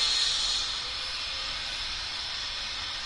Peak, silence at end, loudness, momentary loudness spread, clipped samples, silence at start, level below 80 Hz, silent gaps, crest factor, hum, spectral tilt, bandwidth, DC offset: -14 dBFS; 0 s; -29 LUFS; 7 LU; under 0.1%; 0 s; -50 dBFS; none; 18 dB; none; 1 dB/octave; 11.5 kHz; under 0.1%